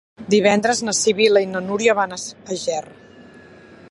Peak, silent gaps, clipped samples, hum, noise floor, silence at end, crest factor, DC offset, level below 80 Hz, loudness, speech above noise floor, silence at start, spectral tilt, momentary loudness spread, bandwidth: -2 dBFS; none; under 0.1%; none; -44 dBFS; 0.15 s; 18 dB; under 0.1%; -60 dBFS; -18 LUFS; 26 dB; 0.2 s; -3 dB/octave; 11 LU; 11.5 kHz